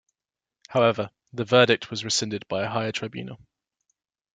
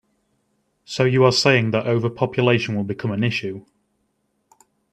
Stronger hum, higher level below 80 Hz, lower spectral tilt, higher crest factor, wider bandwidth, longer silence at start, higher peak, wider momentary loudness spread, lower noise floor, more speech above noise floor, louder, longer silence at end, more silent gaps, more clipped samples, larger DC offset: neither; second, -68 dBFS vs -60 dBFS; second, -4 dB/octave vs -5.5 dB/octave; about the same, 24 dB vs 20 dB; about the same, 9.6 kHz vs 10 kHz; second, 0.7 s vs 0.9 s; second, -4 dBFS vs 0 dBFS; first, 15 LU vs 12 LU; first, under -90 dBFS vs -70 dBFS; first, over 66 dB vs 51 dB; second, -24 LUFS vs -19 LUFS; second, 1 s vs 1.3 s; neither; neither; neither